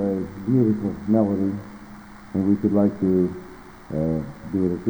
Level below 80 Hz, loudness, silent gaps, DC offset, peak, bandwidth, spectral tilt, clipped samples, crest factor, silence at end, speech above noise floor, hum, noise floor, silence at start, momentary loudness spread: -48 dBFS; -23 LUFS; none; under 0.1%; -6 dBFS; over 20 kHz; -10 dB/octave; under 0.1%; 16 dB; 0 s; 20 dB; none; -42 dBFS; 0 s; 21 LU